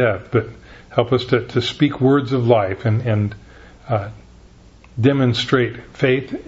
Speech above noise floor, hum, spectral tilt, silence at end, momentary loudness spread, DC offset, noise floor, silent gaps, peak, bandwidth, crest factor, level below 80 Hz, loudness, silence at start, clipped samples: 28 dB; none; -7 dB/octave; 0.05 s; 8 LU; under 0.1%; -45 dBFS; none; 0 dBFS; 8 kHz; 18 dB; -48 dBFS; -19 LUFS; 0 s; under 0.1%